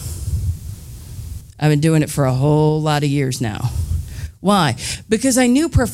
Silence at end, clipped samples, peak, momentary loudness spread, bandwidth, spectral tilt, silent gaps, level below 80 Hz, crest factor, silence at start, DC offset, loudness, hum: 0 s; under 0.1%; -2 dBFS; 18 LU; 16 kHz; -5.5 dB/octave; none; -32 dBFS; 16 dB; 0 s; under 0.1%; -17 LUFS; none